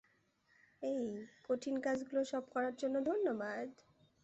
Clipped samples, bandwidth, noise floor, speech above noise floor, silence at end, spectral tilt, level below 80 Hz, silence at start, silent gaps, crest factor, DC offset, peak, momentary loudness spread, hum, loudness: under 0.1%; 8.2 kHz; -75 dBFS; 37 dB; 0.5 s; -5 dB/octave; -80 dBFS; 0.8 s; none; 16 dB; under 0.1%; -24 dBFS; 9 LU; none; -39 LUFS